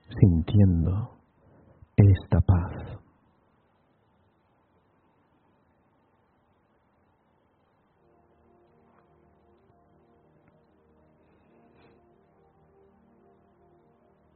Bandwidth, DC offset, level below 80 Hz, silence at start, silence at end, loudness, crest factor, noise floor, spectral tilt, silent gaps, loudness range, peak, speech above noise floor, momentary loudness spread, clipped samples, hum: 4.1 kHz; under 0.1%; -44 dBFS; 0.1 s; 11.4 s; -23 LUFS; 28 dB; -67 dBFS; -10 dB/octave; none; 13 LU; -2 dBFS; 47 dB; 20 LU; under 0.1%; none